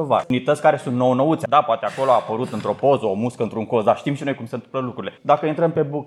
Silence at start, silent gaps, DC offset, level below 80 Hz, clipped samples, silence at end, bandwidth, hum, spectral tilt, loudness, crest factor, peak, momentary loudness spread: 0 s; none; under 0.1%; -68 dBFS; under 0.1%; 0 s; 12.5 kHz; none; -7 dB/octave; -20 LUFS; 18 dB; -2 dBFS; 9 LU